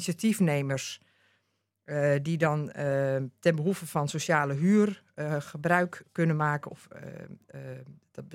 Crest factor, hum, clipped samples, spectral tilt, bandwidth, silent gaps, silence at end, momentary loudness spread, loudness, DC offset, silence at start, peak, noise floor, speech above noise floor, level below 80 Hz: 20 dB; none; under 0.1%; -6 dB/octave; 16.5 kHz; none; 0 s; 19 LU; -28 LUFS; under 0.1%; 0 s; -8 dBFS; -77 dBFS; 48 dB; -74 dBFS